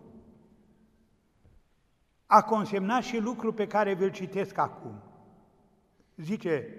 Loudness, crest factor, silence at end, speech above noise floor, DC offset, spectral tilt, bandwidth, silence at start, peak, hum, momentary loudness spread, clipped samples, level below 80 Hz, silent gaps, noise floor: -28 LUFS; 26 dB; 0 s; 42 dB; under 0.1%; -6 dB/octave; 14.5 kHz; 0.15 s; -6 dBFS; none; 18 LU; under 0.1%; -70 dBFS; none; -70 dBFS